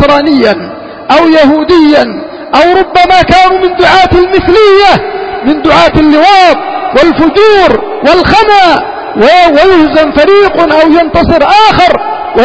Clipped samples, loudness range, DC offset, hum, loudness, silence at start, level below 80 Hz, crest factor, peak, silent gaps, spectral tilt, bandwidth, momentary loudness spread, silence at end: 8%; 1 LU; under 0.1%; none; -5 LUFS; 0 s; -28 dBFS; 4 dB; 0 dBFS; none; -5.5 dB/octave; 8 kHz; 8 LU; 0 s